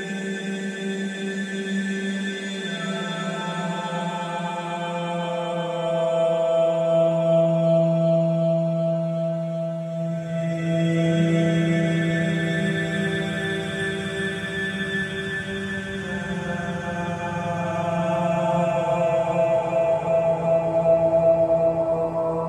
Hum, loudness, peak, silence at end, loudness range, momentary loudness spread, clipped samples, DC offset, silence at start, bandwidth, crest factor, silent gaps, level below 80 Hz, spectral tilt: none; -23 LUFS; -10 dBFS; 0 s; 7 LU; 9 LU; under 0.1%; under 0.1%; 0 s; 10.5 kHz; 14 dB; none; -54 dBFS; -6.5 dB/octave